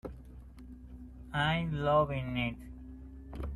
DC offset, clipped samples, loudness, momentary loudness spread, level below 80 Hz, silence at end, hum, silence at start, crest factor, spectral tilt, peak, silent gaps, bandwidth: under 0.1%; under 0.1%; -32 LUFS; 23 LU; -48 dBFS; 0 s; none; 0.05 s; 20 dB; -7.5 dB/octave; -16 dBFS; none; 12.5 kHz